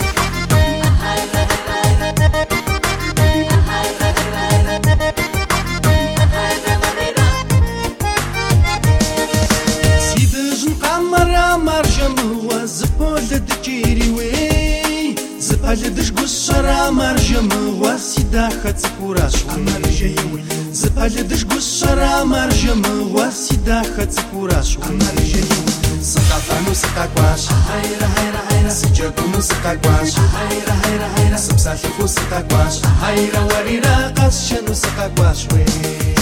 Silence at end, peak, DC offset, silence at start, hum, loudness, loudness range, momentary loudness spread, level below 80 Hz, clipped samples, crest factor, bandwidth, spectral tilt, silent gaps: 0 s; 0 dBFS; under 0.1%; 0 s; none; -16 LUFS; 2 LU; 4 LU; -22 dBFS; under 0.1%; 14 dB; 17.5 kHz; -4.5 dB/octave; none